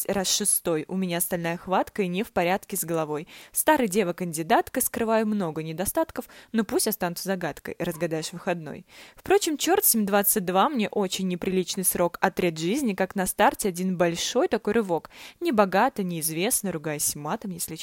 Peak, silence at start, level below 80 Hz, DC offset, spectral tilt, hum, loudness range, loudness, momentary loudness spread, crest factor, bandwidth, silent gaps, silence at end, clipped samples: -4 dBFS; 0 s; -58 dBFS; under 0.1%; -3.5 dB/octave; none; 4 LU; -25 LUFS; 9 LU; 22 dB; 16.5 kHz; none; 0 s; under 0.1%